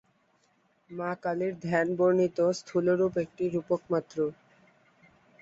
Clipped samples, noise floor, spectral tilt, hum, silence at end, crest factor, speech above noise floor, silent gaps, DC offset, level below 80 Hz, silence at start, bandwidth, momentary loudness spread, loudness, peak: under 0.1%; -69 dBFS; -7 dB/octave; none; 1.1 s; 18 dB; 41 dB; none; under 0.1%; -68 dBFS; 0.9 s; 8 kHz; 8 LU; -29 LUFS; -12 dBFS